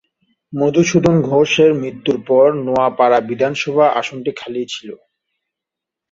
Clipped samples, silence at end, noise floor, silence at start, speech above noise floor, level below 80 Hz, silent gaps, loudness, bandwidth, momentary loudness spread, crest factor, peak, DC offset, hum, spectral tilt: under 0.1%; 1.15 s; -84 dBFS; 0.5 s; 69 dB; -52 dBFS; none; -15 LUFS; 7.8 kHz; 12 LU; 16 dB; -2 dBFS; under 0.1%; none; -5.5 dB/octave